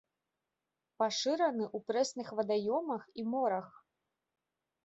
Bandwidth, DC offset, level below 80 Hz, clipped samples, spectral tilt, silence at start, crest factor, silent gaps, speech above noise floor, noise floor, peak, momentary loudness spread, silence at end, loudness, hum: 8 kHz; under 0.1%; -84 dBFS; under 0.1%; -3 dB/octave; 1 s; 18 dB; none; 55 dB; -89 dBFS; -18 dBFS; 7 LU; 1.15 s; -34 LUFS; none